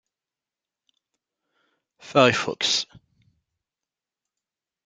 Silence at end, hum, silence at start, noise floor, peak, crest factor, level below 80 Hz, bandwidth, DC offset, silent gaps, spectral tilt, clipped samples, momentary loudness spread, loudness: 2 s; none; 2.05 s; -90 dBFS; -2 dBFS; 26 dB; -70 dBFS; 9.6 kHz; under 0.1%; none; -3 dB/octave; under 0.1%; 6 LU; -21 LUFS